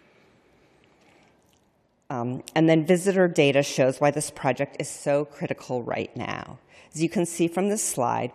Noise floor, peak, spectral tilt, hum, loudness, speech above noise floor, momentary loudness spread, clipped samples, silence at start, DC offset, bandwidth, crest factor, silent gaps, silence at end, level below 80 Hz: -66 dBFS; -6 dBFS; -5 dB/octave; none; -24 LUFS; 42 dB; 12 LU; under 0.1%; 2.1 s; under 0.1%; 14 kHz; 18 dB; none; 0.05 s; -66 dBFS